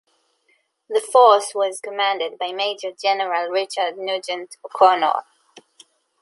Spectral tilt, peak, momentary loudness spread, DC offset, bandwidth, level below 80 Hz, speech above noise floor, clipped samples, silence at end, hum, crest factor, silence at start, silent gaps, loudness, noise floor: -1 dB/octave; -2 dBFS; 12 LU; under 0.1%; 11.5 kHz; -78 dBFS; 46 dB; under 0.1%; 1 s; none; 20 dB; 0.9 s; none; -20 LUFS; -65 dBFS